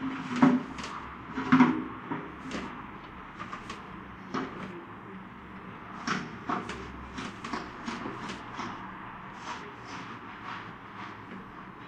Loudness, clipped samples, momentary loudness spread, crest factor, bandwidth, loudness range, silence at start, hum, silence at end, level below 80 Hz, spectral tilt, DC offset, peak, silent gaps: -33 LUFS; under 0.1%; 19 LU; 26 dB; 9 kHz; 11 LU; 0 s; none; 0 s; -58 dBFS; -5.5 dB/octave; under 0.1%; -6 dBFS; none